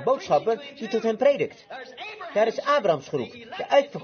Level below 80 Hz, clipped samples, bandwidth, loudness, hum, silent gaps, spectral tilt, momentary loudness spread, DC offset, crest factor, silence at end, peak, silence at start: -72 dBFS; under 0.1%; 6.8 kHz; -24 LUFS; none; none; -5 dB/octave; 15 LU; under 0.1%; 18 dB; 0 s; -6 dBFS; 0 s